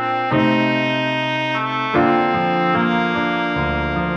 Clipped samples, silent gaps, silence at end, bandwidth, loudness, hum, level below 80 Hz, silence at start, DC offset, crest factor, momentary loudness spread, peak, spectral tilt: under 0.1%; none; 0 s; 8 kHz; -18 LUFS; none; -40 dBFS; 0 s; under 0.1%; 14 dB; 4 LU; -4 dBFS; -7 dB/octave